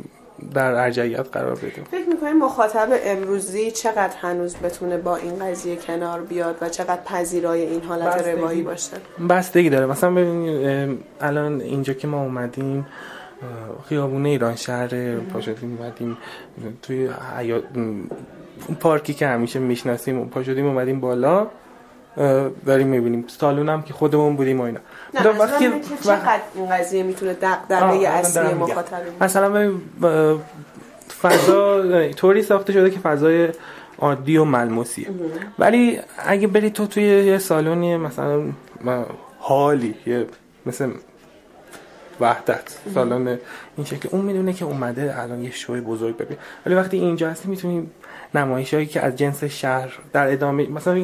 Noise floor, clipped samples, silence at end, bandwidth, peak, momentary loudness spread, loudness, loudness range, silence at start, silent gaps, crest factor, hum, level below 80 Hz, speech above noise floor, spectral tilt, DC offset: -48 dBFS; under 0.1%; 0 s; 16 kHz; -2 dBFS; 13 LU; -20 LUFS; 7 LU; 0.4 s; none; 20 dB; none; -60 dBFS; 28 dB; -6 dB/octave; under 0.1%